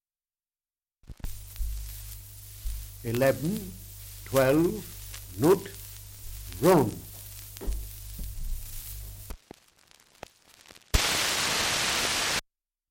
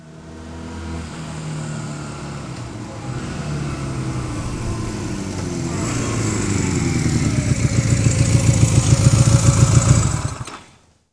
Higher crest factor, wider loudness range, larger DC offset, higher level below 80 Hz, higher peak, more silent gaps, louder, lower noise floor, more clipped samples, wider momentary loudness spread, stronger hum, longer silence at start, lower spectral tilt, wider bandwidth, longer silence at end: first, 24 dB vs 18 dB; about the same, 14 LU vs 13 LU; neither; second, -40 dBFS vs -32 dBFS; second, -8 dBFS vs 0 dBFS; neither; second, -27 LUFS vs -19 LUFS; first, under -90 dBFS vs -50 dBFS; neither; about the same, 19 LU vs 17 LU; neither; first, 1.1 s vs 0 s; second, -3.5 dB/octave vs -5.5 dB/octave; first, 17 kHz vs 11 kHz; about the same, 0.5 s vs 0.5 s